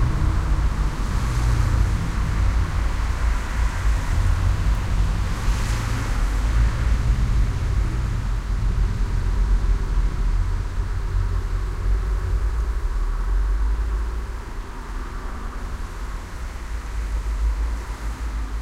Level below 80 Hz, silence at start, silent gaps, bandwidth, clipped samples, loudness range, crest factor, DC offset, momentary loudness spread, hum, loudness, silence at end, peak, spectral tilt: -22 dBFS; 0 s; none; 12 kHz; under 0.1%; 7 LU; 14 dB; under 0.1%; 11 LU; none; -25 LUFS; 0 s; -8 dBFS; -6 dB/octave